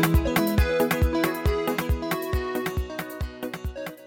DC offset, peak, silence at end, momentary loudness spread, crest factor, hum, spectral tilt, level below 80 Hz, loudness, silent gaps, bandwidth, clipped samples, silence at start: under 0.1%; -8 dBFS; 0 s; 11 LU; 16 dB; none; -6 dB/octave; -30 dBFS; -26 LUFS; none; 18.5 kHz; under 0.1%; 0 s